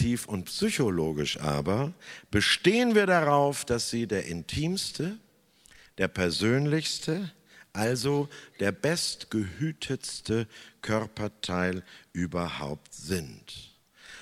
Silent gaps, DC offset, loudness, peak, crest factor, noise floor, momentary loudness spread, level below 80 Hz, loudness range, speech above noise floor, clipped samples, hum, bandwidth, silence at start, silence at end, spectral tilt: none; under 0.1%; -28 LUFS; -8 dBFS; 20 dB; -60 dBFS; 17 LU; -54 dBFS; 7 LU; 31 dB; under 0.1%; none; 16 kHz; 0 s; 0 s; -4.5 dB/octave